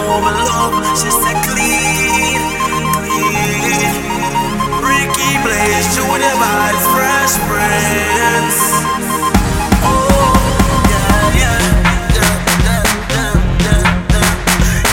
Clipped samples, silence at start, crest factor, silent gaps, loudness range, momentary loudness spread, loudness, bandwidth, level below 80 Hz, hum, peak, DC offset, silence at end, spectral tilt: under 0.1%; 0 s; 12 dB; none; 2 LU; 3 LU; -12 LUFS; 17 kHz; -20 dBFS; none; 0 dBFS; under 0.1%; 0 s; -3.5 dB/octave